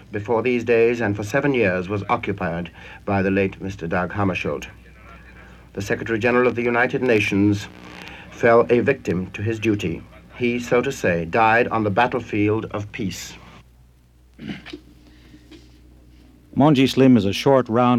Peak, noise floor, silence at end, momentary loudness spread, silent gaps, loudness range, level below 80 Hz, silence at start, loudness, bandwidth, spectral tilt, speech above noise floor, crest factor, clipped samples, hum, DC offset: -4 dBFS; -52 dBFS; 0 s; 19 LU; none; 8 LU; -48 dBFS; 0.1 s; -20 LUFS; 15 kHz; -6.5 dB/octave; 33 dB; 18 dB; under 0.1%; none; under 0.1%